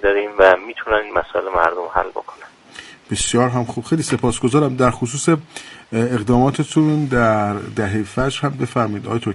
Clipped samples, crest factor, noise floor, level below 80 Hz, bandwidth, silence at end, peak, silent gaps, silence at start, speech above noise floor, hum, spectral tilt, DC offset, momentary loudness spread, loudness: under 0.1%; 18 dB; -40 dBFS; -40 dBFS; 11.5 kHz; 0 s; 0 dBFS; none; 0 s; 22 dB; none; -5.5 dB/octave; under 0.1%; 11 LU; -18 LUFS